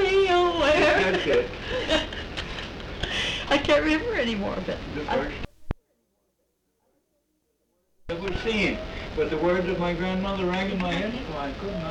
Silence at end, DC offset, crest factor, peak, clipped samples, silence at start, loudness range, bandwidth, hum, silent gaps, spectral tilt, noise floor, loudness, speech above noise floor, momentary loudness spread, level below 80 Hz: 0 s; under 0.1%; 16 dB; -10 dBFS; under 0.1%; 0 s; 11 LU; 11 kHz; none; none; -5 dB/octave; -73 dBFS; -25 LUFS; 48 dB; 13 LU; -40 dBFS